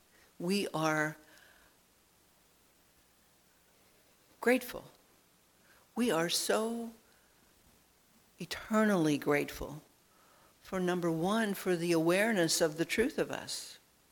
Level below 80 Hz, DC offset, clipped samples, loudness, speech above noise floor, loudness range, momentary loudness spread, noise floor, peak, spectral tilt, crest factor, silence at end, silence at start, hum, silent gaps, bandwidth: -64 dBFS; under 0.1%; under 0.1%; -32 LUFS; 36 dB; 8 LU; 16 LU; -67 dBFS; -16 dBFS; -4 dB/octave; 20 dB; 0.35 s; 0.4 s; none; none; 19 kHz